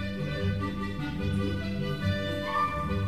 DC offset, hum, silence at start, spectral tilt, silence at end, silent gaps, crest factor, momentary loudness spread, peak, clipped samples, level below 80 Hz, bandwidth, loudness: 0.5%; none; 0 s; -7 dB/octave; 0 s; none; 14 dB; 4 LU; -16 dBFS; under 0.1%; -44 dBFS; 14 kHz; -31 LUFS